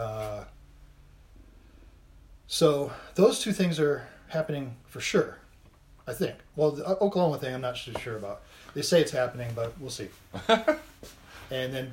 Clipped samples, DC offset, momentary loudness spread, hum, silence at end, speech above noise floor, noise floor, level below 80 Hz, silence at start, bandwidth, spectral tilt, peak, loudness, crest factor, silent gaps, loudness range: under 0.1%; under 0.1%; 16 LU; none; 0 s; 28 dB; -55 dBFS; -56 dBFS; 0 s; 16 kHz; -5 dB/octave; -8 dBFS; -28 LUFS; 22 dB; none; 3 LU